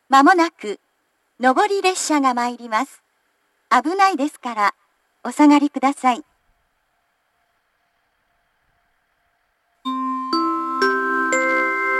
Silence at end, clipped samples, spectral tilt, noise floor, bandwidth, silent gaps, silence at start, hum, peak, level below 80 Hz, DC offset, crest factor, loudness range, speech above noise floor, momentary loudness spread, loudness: 0 s; under 0.1%; -2 dB/octave; -68 dBFS; 12.5 kHz; none; 0.1 s; none; 0 dBFS; -76 dBFS; under 0.1%; 20 dB; 10 LU; 51 dB; 14 LU; -19 LUFS